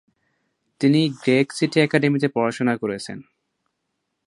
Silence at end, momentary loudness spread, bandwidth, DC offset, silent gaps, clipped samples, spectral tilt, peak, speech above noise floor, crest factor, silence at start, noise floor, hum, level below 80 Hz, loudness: 1.05 s; 11 LU; 11.5 kHz; under 0.1%; none; under 0.1%; -6 dB/octave; -2 dBFS; 57 dB; 20 dB; 0.8 s; -77 dBFS; none; -66 dBFS; -20 LUFS